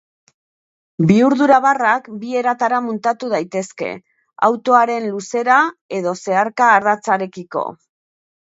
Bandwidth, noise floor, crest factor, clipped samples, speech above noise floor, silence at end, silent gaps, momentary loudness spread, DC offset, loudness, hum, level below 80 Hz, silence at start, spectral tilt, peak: 8 kHz; under -90 dBFS; 18 dB; under 0.1%; over 74 dB; 0.75 s; 5.81-5.89 s; 12 LU; under 0.1%; -17 LUFS; none; -64 dBFS; 1 s; -6 dB/octave; 0 dBFS